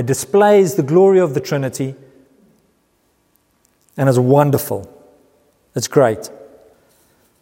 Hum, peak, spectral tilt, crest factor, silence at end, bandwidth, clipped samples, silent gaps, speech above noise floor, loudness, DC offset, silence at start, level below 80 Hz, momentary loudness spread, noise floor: none; 0 dBFS; -6 dB/octave; 16 dB; 1 s; 16.5 kHz; under 0.1%; none; 47 dB; -15 LUFS; under 0.1%; 0 s; -60 dBFS; 15 LU; -61 dBFS